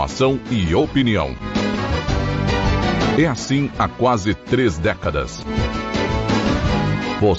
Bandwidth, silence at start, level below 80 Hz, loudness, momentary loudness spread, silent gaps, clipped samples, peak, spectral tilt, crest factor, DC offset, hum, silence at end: 8 kHz; 0 s; -30 dBFS; -19 LUFS; 5 LU; none; under 0.1%; -6 dBFS; -6 dB/octave; 12 dB; under 0.1%; none; 0 s